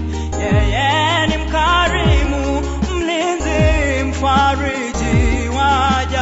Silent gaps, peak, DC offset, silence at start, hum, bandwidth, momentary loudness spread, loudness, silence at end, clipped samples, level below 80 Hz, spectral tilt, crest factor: none; -4 dBFS; under 0.1%; 0 s; none; 8 kHz; 6 LU; -16 LUFS; 0 s; under 0.1%; -22 dBFS; -5 dB/octave; 12 dB